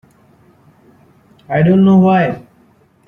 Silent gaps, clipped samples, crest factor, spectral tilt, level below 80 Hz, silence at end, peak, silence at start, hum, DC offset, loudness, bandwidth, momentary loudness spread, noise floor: none; under 0.1%; 14 dB; -10 dB/octave; -52 dBFS; 0.7 s; -2 dBFS; 1.5 s; none; under 0.1%; -12 LUFS; 3.8 kHz; 11 LU; -51 dBFS